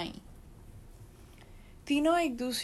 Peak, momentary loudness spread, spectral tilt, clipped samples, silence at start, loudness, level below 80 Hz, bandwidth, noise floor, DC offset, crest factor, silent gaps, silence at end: -18 dBFS; 27 LU; -4 dB/octave; under 0.1%; 0 s; -30 LUFS; -54 dBFS; 13.5 kHz; -53 dBFS; under 0.1%; 16 dB; none; 0 s